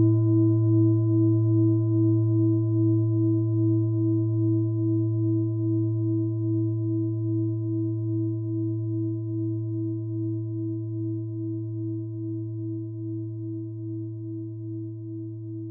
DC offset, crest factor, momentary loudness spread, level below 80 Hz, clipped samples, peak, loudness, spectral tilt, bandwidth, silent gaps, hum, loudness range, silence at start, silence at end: under 0.1%; 12 dB; 13 LU; -64 dBFS; under 0.1%; -12 dBFS; -26 LUFS; -17.5 dB/octave; 1.1 kHz; none; none; 10 LU; 0 s; 0 s